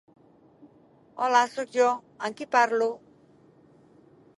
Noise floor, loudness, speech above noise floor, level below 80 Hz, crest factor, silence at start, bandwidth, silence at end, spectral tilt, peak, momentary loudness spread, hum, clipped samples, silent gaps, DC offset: -58 dBFS; -25 LUFS; 33 dB; -80 dBFS; 22 dB; 1.15 s; 11.5 kHz; 1.4 s; -2.5 dB/octave; -8 dBFS; 12 LU; none; under 0.1%; none; under 0.1%